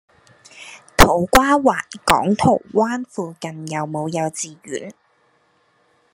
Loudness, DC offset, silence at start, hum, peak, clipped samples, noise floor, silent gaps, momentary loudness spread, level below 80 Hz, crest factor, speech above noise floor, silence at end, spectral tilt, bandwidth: -18 LUFS; under 0.1%; 0.55 s; none; 0 dBFS; under 0.1%; -61 dBFS; none; 17 LU; -34 dBFS; 20 dB; 42 dB; 1.2 s; -4.5 dB/octave; 13 kHz